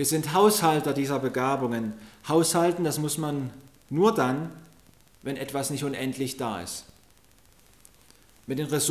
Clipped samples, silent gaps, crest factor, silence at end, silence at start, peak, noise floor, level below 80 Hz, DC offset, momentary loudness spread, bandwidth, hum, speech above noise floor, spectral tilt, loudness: under 0.1%; none; 20 dB; 0 s; 0 s; -8 dBFS; -59 dBFS; -62 dBFS; under 0.1%; 15 LU; 16 kHz; none; 33 dB; -4.5 dB/octave; -26 LUFS